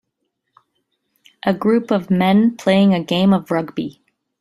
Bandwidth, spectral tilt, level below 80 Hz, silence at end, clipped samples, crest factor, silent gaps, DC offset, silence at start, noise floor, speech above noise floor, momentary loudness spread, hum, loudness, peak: 12.5 kHz; -7.5 dB/octave; -58 dBFS; 0.5 s; under 0.1%; 16 dB; none; under 0.1%; 1.45 s; -74 dBFS; 58 dB; 10 LU; none; -17 LUFS; -2 dBFS